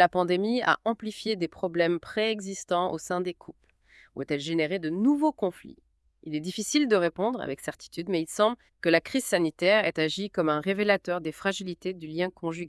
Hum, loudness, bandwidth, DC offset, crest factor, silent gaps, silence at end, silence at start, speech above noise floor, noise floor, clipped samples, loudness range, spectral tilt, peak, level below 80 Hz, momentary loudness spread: none; -27 LUFS; 12 kHz; under 0.1%; 22 dB; none; 0 s; 0 s; 32 dB; -59 dBFS; under 0.1%; 4 LU; -4.5 dB/octave; -6 dBFS; -66 dBFS; 11 LU